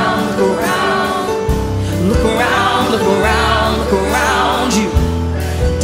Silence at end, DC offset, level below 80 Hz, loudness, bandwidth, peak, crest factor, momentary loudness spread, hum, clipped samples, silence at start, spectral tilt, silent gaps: 0 s; under 0.1%; -24 dBFS; -14 LUFS; 16 kHz; 0 dBFS; 14 dB; 5 LU; none; under 0.1%; 0 s; -5 dB/octave; none